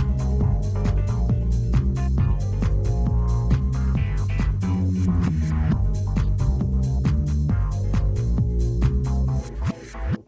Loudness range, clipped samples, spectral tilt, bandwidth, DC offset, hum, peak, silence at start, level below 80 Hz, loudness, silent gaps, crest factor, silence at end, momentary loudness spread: 0 LU; under 0.1%; -8.5 dB/octave; 8 kHz; under 0.1%; none; -8 dBFS; 0 s; -24 dBFS; -23 LUFS; none; 14 dB; 0.05 s; 2 LU